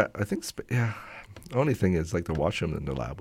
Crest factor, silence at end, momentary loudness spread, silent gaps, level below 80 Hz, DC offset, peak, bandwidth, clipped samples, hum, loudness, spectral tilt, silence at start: 20 dB; 0 s; 9 LU; none; -46 dBFS; under 0.1%; -10 dBFS; 16 kHz; under 0.1%; none; -29 LUFS; -6.5 dB/octave; 0 s